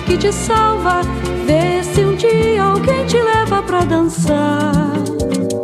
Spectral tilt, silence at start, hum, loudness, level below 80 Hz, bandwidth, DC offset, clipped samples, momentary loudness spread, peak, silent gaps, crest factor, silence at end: -5.5 dB/octave; 0 s; none; -15 LUFS; -32 dBFS; 14.5 kHz; under 0.1%; under 0.1%; 5 LU; -2 dBFS; none; 14 dB; 0 s